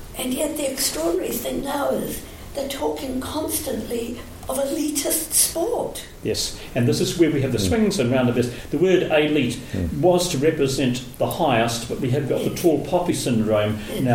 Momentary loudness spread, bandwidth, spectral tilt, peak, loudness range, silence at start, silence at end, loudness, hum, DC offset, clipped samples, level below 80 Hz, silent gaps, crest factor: 8 LU; 17 kHz; -4.5 dB/octave; -4 dBFS; 5 LU; 0 s; 0 s; -22 LUFS; none; under 0.1%; under 0.1%; -42 dBFS; none; 18 dB